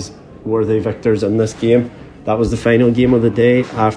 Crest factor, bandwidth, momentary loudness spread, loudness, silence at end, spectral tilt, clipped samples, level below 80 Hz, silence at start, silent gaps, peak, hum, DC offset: 14 dB; 10.5 kHz; 11 LU; -15 LUFS; 0 s; -7 dB/octave; under 0.1%; -38 dBFS; 0 s; none; 0 dBFS; none; under 0.1%